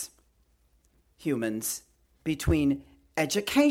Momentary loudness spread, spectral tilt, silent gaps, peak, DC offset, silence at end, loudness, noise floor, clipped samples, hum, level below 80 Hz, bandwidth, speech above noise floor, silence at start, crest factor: 12 LU; -4.5 dB/octave; none; -10 dBFS; under 0.1%; 0 s; -29 LUFS; -67 dBFS; under 0.1%; none; -44 dBFS; 17 kHz; 40 dB; 0 s; 20 dB